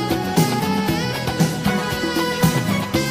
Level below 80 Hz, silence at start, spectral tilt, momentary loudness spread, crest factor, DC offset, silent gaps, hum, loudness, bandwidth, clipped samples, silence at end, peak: -42 dBFS; 0 s; -5 dB/octave; 3 LU; 16 dB; under 0.1%; none; none; -20 LUFS; 15.5 kHz; under 0.1%; 0 s; -4 dBFS